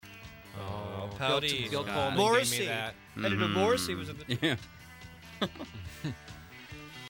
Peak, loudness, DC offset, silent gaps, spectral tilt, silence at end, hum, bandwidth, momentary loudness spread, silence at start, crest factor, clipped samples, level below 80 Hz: -12 dBFS; -31 LUFS; under 0.1%; none; -4 dB/octave; 0 s; none; over 20 kHz; 21 LU; 0.05 s; 20 dB; under 0.1%; -58 dBFS